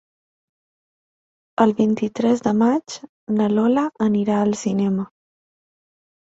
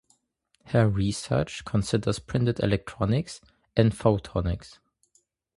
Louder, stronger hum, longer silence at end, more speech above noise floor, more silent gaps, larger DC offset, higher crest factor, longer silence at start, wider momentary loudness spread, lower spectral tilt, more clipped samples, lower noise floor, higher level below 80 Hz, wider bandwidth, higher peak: first, -20 LUFS vs -26 LUFS; neither; first, 1.15 s vs 0.9 s; first, over 71 dB vs 46 dB; first, 3.09-3.27 s vs none; neither; about the same, 20 dB vs 22 dB; first, 1.6 s vs 0.65 s; first, 10 LU vs 7 LU; about the same, -6.5 dB/octave vs -6.5 dB/octave; neither; first, under -90 dBFS vs -71 dBFS; second, -62 dBFS vs -44 dBFS; second, 8 kHz vs 11.5 kHz; first, -2 dBFS vs -6 dBFS